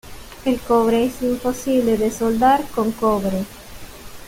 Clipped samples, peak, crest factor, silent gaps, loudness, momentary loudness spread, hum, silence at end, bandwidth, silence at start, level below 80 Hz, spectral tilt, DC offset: under 0.1%; -4 dBFS; 16 dB; none; -19 LUFS; 22 LU; none; 0 s; 17 kHz; 0.05 s; -42 dBFS; -5.5 dB/octave; under 0.1%